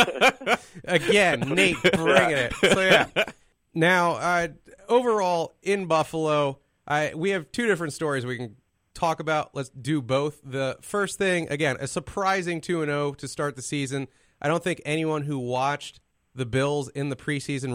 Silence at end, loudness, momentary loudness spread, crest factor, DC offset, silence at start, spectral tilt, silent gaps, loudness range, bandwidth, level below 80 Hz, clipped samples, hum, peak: 0 s; -24 LUFS; 11 LU; 22 dB; under 0.1%; 0 s; -4.5 dB/octave; none; 7 LU; 16 kHz; -56 dBFS; under 0.1%; none; -4 dBFS